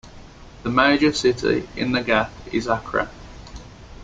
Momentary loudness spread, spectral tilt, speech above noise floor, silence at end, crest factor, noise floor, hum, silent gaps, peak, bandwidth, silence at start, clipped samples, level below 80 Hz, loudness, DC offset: 23 LU; -5 dB/octave; 21 dB; 0 s; 20 dB; -42 dBFS; none; none; -2 dBFS; 9.4 kHz; 0.05 s; under 0.1%; -44 dBFS; -21 LUFS; under 0.1%